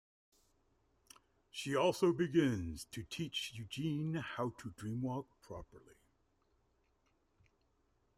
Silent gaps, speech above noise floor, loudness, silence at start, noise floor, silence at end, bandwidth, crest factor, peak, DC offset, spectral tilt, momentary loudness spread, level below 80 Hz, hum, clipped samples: none; 39 dB; -38 LUFS; 1.55 s; -77 dBFS; 2.25 s; 15.5 kHz; 20 dB; -20 dBFS; under 0.1%; -5.5 dB/octave; 16 LU; -66 dBFS; none; under 0.1%